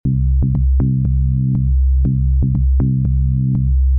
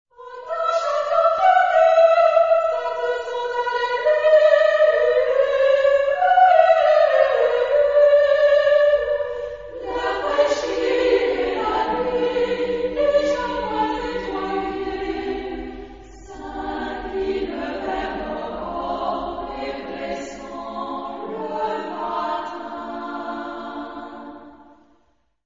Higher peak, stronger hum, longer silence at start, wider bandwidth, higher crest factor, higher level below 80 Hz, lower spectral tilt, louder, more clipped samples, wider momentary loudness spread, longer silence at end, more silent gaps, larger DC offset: second, -10 dBFS vs -2 dBFS; neither; second, 0.05 s vs 0.2 s; second, 1.2 kHz vs 7.6 kHz; second, 4 dB vs 18 dB; first, -16 dBFS vs -48 dBFS; first, -15.5 dB/octave vs -4.5 dB/octave; first, -16 LUFS vs -20 LUFS; neither; second, 1 LU vs 16 LU; second, 0 s vs 0.95 s; neither; about the same, 0.4% vs 0.2%